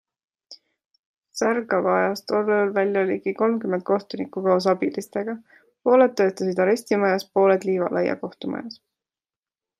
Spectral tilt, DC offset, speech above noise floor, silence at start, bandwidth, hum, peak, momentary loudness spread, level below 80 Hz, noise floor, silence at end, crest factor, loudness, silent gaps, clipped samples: -6 dB/octave; under 0.1%; over 68 dB; 0.5 s; 14.5 kHz; none; -6 dBFS; 12 LU; -74 dBFS; under -90 dBFS; 1.05 s; 18 dB; -22 LUFS; 0.86-0.90 s, 0.99-1.22 s; under 0.1%